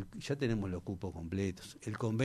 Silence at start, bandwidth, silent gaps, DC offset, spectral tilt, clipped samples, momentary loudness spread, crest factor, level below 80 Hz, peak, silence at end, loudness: 0 s; 13.5 kHz; none; under 0.1%; -6.5 dB/octave; under 0.1%; 7 LU; 16 dB; -56 dBFS; -20 dBFS; 0 s; -38 LUFS